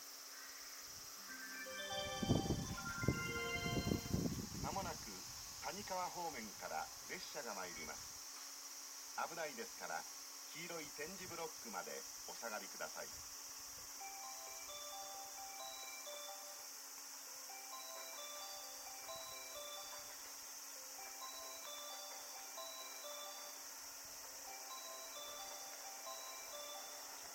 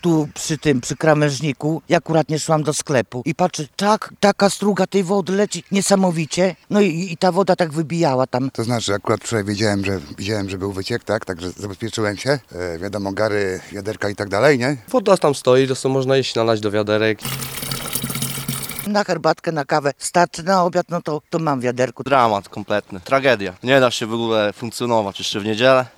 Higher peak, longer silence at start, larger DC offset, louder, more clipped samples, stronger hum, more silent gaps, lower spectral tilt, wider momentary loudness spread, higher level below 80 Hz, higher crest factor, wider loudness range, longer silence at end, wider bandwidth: second, -20 dBFS vs 0 dBFS; about the same, 0 s vs 0.05 s; neither; second, -47 LUFS vs -19 LUFS; neither; neither; neither; second, -3 dB/octave vs -5 dB/octave; about the same, 8 LU vs 9 LU; second, -64 dBFS vs -54 dBFS; first, 28 dB vs 18 dB; about the same, 7 LU vs 5 LU; about the same, 0 s vs 0.1 s; second, 17 kHz vs over 20 kHz